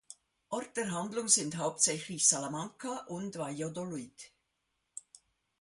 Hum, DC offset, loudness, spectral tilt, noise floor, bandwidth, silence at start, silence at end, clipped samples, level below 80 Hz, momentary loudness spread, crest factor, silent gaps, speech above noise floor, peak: none; under 0.1%; -32 LUFS; -2.5 dB/octave; -82 dBFS; 11.5 kHz; 0.1 s; 0.6 s; under 0.1%; -76 dBFS; 22 LU; 26 dB; none; 48 dB; -10 dBFS